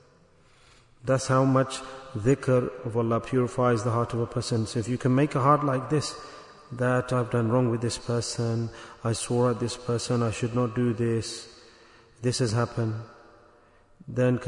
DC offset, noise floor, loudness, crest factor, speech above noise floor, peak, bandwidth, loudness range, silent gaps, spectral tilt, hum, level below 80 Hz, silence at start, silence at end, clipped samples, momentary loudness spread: under 0.1%; -58 dBFS; -26 LUFS; 20 dB; 33 dB; -8 dBFS; 11 kHz; 4 LU; none; -6 dB/octave; none; -56 dBFS; 1.05 s; 0 s; under 0.1%; 13 LU